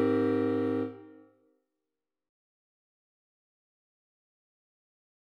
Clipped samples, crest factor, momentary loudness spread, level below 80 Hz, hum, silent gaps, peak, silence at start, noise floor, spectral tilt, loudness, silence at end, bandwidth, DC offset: under 0.1%; 20 dB; 13 LU; -86 dBFS; none; none; -16 dBFS; 0 s; -89 dBFS; -9 dB/octave; -30 LUFS; 4.2 s; 5.2 kHz; under 0.1%